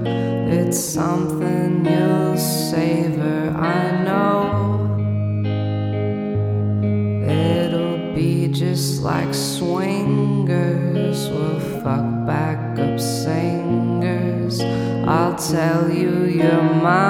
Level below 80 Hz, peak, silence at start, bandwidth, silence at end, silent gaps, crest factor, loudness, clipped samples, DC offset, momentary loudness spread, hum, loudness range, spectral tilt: -50 dBFS; -4 dBFS; 0 s; 16.5 kHz; 0 s; none; 14 dB; -20 LUFS; under 0.1%; under 0.1%; 4 LU; none; 2 LU; -6.5 dB/octave